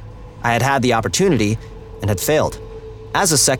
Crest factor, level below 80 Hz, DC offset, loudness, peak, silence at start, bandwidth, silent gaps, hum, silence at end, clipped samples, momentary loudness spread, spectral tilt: 16 dB; -38 dBFS; under 0.1%; -18 LUFS; -2 dBFS; 0 s; 19.5 kHz; none; none; 0 s; under 0.1%; 19 LU; -3.5 dB/octave